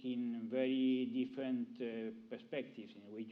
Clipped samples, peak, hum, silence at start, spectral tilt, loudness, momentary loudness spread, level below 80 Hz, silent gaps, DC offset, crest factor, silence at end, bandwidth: under 0.1%; -26 dBFS; none; 0 s; -8 dB/octave; -40 LUFS; 16 LU; under -90 dBFS; none; under 0.1%; 14 dB; 0 s; 5 kHz